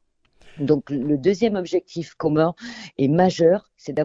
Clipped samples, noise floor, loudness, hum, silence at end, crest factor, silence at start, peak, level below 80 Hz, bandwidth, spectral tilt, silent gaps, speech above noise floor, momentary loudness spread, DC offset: under 0.1%; -53 dBFS; -21 LUFS; none; 0 s; 18 dB; 0.45 s; -4 dBFS; -56 dBFS; 7.8 kHz; -7 dB/octave; none; 32 dB; 12 LU; under 0.1%